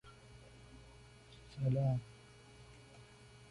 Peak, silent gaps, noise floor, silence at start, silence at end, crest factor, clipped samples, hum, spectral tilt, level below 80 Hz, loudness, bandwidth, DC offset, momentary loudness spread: -24 dBFS; none; -59 dBFS; 0.05 s; 0.05 s; 18 dB; under 0.1%; none; -8 dB/octave; -64 dBFS; -37 LUFS; 11.5 kHz; under 0.1%; 24 LU